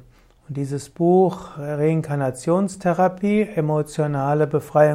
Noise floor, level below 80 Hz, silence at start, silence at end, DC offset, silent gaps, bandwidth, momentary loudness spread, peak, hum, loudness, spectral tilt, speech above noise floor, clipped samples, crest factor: -49 dBFS; -54 dBFS; 0.5 s; 0 s; under 0.1%; none; 14 kHz; 11 LU; -4 dBFS; none; -21 LUFS; -7.5 dB/octave; 29 dB; under 0.1%; 16 dB